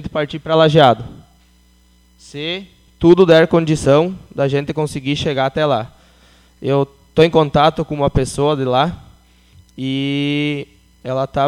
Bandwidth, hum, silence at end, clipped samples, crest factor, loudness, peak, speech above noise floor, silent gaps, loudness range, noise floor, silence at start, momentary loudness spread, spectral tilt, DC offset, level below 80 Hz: 12.5 kHz; 60 Hz at -50 dBFS; 0 s; under 0.1%; 16 dB; -16 LUFS; 0 dBFS; 37 dB; none; 5 LU; -52 dBFS; 0 s; 16 LU; -6.5 dB/octave; under 0.1%; -40 dBFS